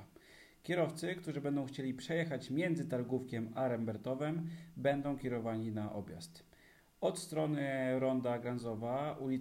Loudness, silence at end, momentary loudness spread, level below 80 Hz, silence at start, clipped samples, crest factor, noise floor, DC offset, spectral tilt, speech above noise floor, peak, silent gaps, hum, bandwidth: -38 LUFS; 0 s; 7 LU; -70 dBFS; 0 s; under 0.1%; 18 dB; -65 dBFS; under 0.1%; -6.5 dB/octave; 28 dB; -20 dBFS; none; none; 16 kHz